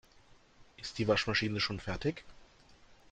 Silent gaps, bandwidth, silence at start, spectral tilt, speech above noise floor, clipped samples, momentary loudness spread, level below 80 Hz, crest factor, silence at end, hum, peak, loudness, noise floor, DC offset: none; 9.2 kHz; 0.6 s; -5 dB/octave; 28 dB; under 0.1%; 15 LU; -56 dBFS; 20 dB; 0.2 s; none; -16 dBFS; -33 LUFS; -62 dBFS; under 0.1%